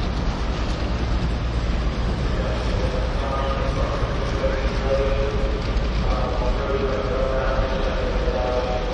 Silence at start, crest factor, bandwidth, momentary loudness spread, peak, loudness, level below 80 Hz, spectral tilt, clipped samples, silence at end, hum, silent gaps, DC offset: 0 s; 14 dB; 8.4 kHz; 2 LU; -8 dBFS; -24 LUFS; -24 dBFS; -6.5 dB/octave; under 0.1%; 0 s; none; none; under 0.1%